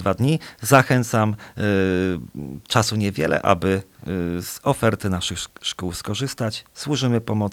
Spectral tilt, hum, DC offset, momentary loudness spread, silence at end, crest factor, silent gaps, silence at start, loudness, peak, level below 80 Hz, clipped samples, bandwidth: -5 dB/octave; none; under 0.1%; 9 LU; 0 s; 22 dB; none; 0 s; -22 LUFS; 0 dBFS; -48 dBFS; under 0.1%; 18 kHz